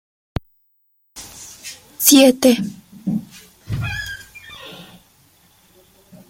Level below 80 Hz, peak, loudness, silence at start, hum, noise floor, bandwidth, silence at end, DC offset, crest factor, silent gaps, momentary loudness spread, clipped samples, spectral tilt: -46 dBFS; 0 dBFS; -16 LUFS; 1.15 s; none; -63 dBFS; 16.5 kHz; 1.45 s; under 0.1%; 22 dB; none; 26 LU; under 0.1%; -3.5 dB/octave